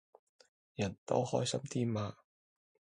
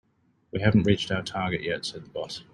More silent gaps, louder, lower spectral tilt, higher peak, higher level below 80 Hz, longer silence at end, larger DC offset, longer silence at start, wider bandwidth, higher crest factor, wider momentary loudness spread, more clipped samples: first, 0.98-1.06 s vs none; second, -36 LUFS vs -27 LUFS; about the same, -5.5 dB/octave vs -6 dB/octave; second, -16 dBFS vs -6 dBFS; second, -66 dBFS vs -52 dBFS; first, 0.85 s vs 0.1 s; neither; first, 0.8 s vs 0.55 s; about the same, 11.5 kHz vs 11 kHz; about the same, 22 dB vs 20 dB; second, 8 LU vs 13 LU; neither